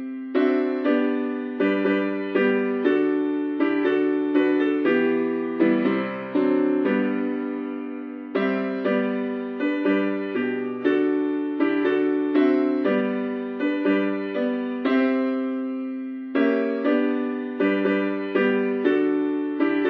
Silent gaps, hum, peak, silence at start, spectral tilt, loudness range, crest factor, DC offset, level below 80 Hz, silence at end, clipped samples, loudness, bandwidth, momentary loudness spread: none; none; -8 dBFS; 0 s; -8.5 dB/octave; 3 LU; 14 dB; under 0.1%; -86 dBFS; 0 s; under 0.1%; -23 LUFS; 5 kHz; 6 LU